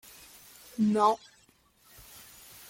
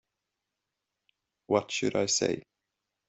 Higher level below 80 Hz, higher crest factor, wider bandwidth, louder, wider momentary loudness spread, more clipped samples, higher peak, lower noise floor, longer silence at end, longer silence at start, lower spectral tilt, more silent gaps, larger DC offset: about the same, -68 dBFS vs -72 dBFS; about the same, 22 dB vs 22 dB; first, 17 kHz vs 8.2 kHz; about the same, -27 LUFS vs -29 LUFS; first, 25 LU vs 5 LU; neither; about the same, -12 dBFS vs -10 dBFS; second, -64 dBFS vs -86 dBFS; first, 1.55 s vs 0.65 s; second, 0.8 s vs 1.5 s; first, -6 dB/octave vs -3 dB/octave; neither; neither